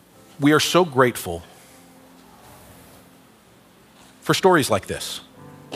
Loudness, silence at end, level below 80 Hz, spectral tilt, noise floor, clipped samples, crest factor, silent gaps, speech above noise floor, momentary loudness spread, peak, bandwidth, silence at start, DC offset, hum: -20 LUFS; 0 s; -60 dBFS; -4.5 dB/octave; -52 dBFS; under 0.1%; 22 dB; none; 33 dB; 16 LU; -2 dBFS; 16 kHz; 0.4 s; under 0.1%; none